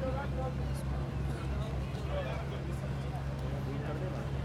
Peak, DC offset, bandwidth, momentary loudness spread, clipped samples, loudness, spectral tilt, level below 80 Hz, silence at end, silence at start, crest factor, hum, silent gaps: -24 dBFS; under 0.1%; 13 kHz; 2 LU; under 0.1%; -37 LUFS; -7.5 dB/octave; -40 dBFS; 0 s; 0 s; 12 dB; none; none